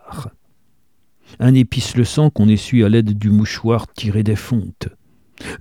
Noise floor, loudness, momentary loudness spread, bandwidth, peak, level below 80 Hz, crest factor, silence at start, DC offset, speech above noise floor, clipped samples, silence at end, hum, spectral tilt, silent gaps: -65 dBFS; -16 LUFS; 19 LU; 14 kHz; -2 dBFS; -44 dBFS; 16 dB; 0.1 s; 0.2%; 50 dB; under 0.1%; 0.05 s; none; -7 dB/octave; none